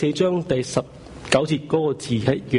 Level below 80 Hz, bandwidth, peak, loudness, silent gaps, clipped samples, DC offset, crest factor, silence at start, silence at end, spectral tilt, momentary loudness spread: -50 dBFS; 11 kHz; -4 dBFS; -22 LUFS; none; under 0.1%; under 0.1%; 18 dB; 0 s; 0 s; -5.5 dB/octave; 7 LU